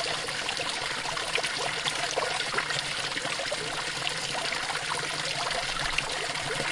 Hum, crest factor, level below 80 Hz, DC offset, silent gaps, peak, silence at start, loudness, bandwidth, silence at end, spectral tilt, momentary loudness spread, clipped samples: none; 22 dB; -52 dBFS; under 0.1%; none; -10 dBFS; 0 s; -29 LUFS; 11.5 kHz; 0 s; -1 dB/octave; 2 LU; under 0.1%